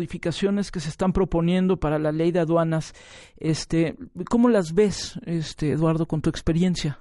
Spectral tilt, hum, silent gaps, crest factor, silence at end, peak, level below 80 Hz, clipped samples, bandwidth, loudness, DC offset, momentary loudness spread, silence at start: -6.5 dB/octave; none; none; 16 dB; 0.05 s; -8 dBFS; -40 dBFS; under 0.1%; 11.5 kHz; -23 LUFS; under 0.1%; 9 LU; 0 s